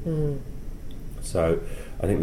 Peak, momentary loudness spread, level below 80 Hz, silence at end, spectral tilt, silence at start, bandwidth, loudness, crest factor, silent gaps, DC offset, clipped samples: -10 dBFS; 17 LU; -34 dBFS; 0 s; -7 dB/octave; 0 s; 15.5 kHz; -28 LUFS; 16 dB; none; 0.4%; under 0.1%